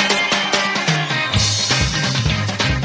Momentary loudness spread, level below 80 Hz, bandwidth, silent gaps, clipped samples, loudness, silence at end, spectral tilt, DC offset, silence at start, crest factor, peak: 3 LU; -32 dBFS; 8 kHz; none; under 0.1%; -16 LUFS; 0 s; -3 dB/octave; under 0.1%; 0 s; 16 dB; -2 dBFS